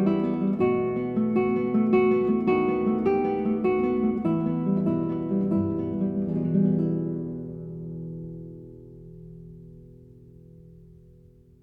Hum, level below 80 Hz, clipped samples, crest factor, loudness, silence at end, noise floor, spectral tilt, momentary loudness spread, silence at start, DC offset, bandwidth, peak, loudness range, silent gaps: none; -54 dBFS; under 0.1%; 16 dB; -25 LUFS; 0.95 s; -53 dBFS; -11 dB/octave; 21 LU; 0 s; under 0.1%; 4.7 kHz; -10 dBFS; 17 LU; none